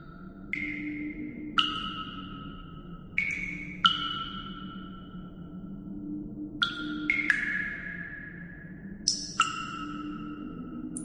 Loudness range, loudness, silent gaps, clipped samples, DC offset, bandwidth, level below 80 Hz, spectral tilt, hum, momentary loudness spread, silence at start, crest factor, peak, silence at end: 3 LU; -31 LUFS; none; under 0.1%; under 0.1%; 11 kHz; -52 dBFS; -2 dB/octave; none; 18 LU; 0 s; 28 dB; -6 dBFS; 0 s